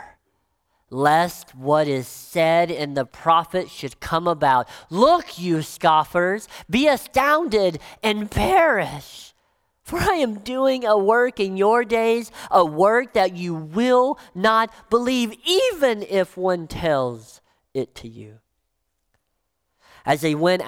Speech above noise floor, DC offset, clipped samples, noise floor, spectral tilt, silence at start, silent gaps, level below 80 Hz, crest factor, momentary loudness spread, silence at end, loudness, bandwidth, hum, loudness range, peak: 55 dB; under 0.1%; under 0.1%; -75 dBFS; -5 dB/octave; 0 s; none; -48 dBFS; 18 dB; 12 LU; 0 s; -20 LUFS; 17 kHz; none; 6 LU; -4 dBFS